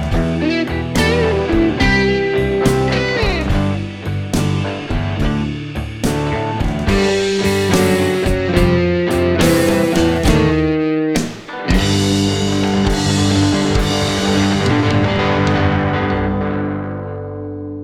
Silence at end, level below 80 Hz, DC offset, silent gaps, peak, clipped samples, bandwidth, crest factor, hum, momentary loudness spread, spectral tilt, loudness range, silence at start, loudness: 0 s; -26 dBFS; 0.7%; none; 0 dBFS; under 0.1%; 16.5 kHz; 16 dB; none; 7 LU; -5.5 dB/octave; 4 LU; 0 s; -16 LUFS